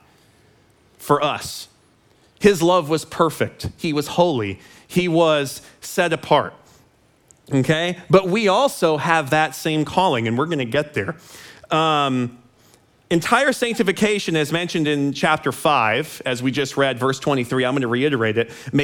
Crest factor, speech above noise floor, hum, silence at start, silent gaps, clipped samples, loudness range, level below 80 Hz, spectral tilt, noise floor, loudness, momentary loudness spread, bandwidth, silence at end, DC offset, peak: 20 dB; 37 dB; none; 1 s; none; under 0.1%; 3 LU; -56 dBFS; -5 dB/octave; -56 dBFS; -20 LUFS; 9 LU; 19 kHz; 0 s; under 0.1%; 0 dBFS